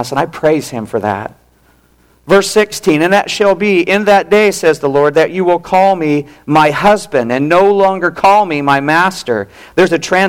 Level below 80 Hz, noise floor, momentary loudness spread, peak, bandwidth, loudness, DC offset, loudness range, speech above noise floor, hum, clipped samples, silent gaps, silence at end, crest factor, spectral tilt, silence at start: -46 dBFS; -50 dBFS; 8 LU; -2 dBFS; 16.5 kHz; -11 LUFS; under 0.1%; 3 LU; 39 dB; none; under 0.1%; none; 0 s; 10 dB; -5 dB/octave; 0 s